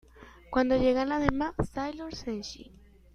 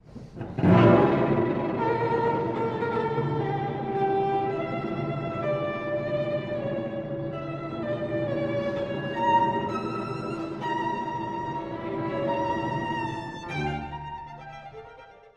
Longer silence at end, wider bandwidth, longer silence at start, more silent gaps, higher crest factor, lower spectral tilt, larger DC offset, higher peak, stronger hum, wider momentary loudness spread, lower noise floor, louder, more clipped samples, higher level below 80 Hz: first, 0.45 s vs 0.2 s; first, 11 kHz vs 8.6 kHz; about the same, 0.15 s vs 0.05 s; neither; first, 26 dB vs 20 dB; second, -6 dB/octave vs -8.5 dB/octave; neither; about the same, -4 dBFS vs -6 dBFS; neither; about the same, 13 LU vs 12 LU; about the same, -50 dBFS vs -49 dBFS; about the same, -29 LUFS vs -27 LUFS; neither; first, -44 dBFS vs -52 dBFS